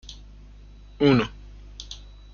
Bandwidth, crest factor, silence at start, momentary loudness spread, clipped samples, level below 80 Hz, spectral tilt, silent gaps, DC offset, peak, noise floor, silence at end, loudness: 7.2 kHz; 20 dB; 0.1 s; 25 LU; under 0.1%; -44 dBFS; -6.5 dB/octave; none; under 0.1%; -6 dBFS; -46 dBFS; 0.35 s; -22 LUFS